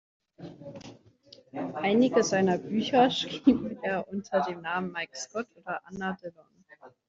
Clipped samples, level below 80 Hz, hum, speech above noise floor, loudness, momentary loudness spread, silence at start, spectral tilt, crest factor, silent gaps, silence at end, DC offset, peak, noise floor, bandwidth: under 0.1%; -66 dBFS; none; 29 dB; -28 LUFS; 21 LU; 0.4 s; -5 dB/octave; 20 dB; none; 0.2 s; under 0.1%; -8 dBFS; -56 dBFS; 7.8 kHz